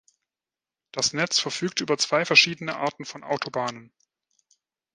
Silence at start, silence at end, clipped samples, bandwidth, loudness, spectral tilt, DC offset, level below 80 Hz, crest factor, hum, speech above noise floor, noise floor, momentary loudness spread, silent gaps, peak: 0.95 s; 1.1 s; under 0.1%; 11 kHz; -23 LUFS; -2 dB/octave; under 0.1%; -72 dBFS; 26 dB; none; over 65 dB; under -90 dBFS; 13 LU; none; -2 dBFS